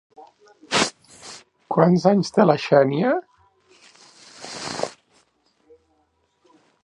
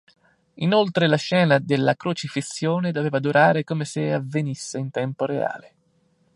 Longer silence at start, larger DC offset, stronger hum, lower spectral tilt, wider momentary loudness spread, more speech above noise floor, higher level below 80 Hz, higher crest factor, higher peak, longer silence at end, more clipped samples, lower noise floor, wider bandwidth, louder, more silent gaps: second, 0.2 s vs 0.55 s; neither; neither; about the same, -5.5 dB/octave vs -6 dB/octave; first, 23 LU vs 10 LU; first, 50 dB vs 42 dB; about the same, -64 dBFS vs -68 dBFS; about the same, 22 dB vs 20 dB; about the same, -2 dBFS vs -4 dBFS; first, 1.95 s vs 0.7 s; neither; about the same, -67 dBFS vs -64 dBFS; about the same, 11.5 kHz vs 11.5 kHz; about the same, -20 LUFS vs -22 LUFS; neither